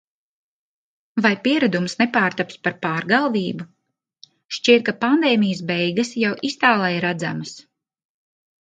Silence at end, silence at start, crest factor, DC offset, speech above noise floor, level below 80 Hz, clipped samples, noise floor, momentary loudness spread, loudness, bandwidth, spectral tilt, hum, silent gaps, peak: 1.05 s; 1.15 s; 20 dB; under 0.1%; 33 dB; -68 dBFS; under 0.1%; -53 dBFS; 12 LU; -20 LUFS; 9.2 kHz; -5 dB/octave; none; 4.45-4.49 s; -2 dBFS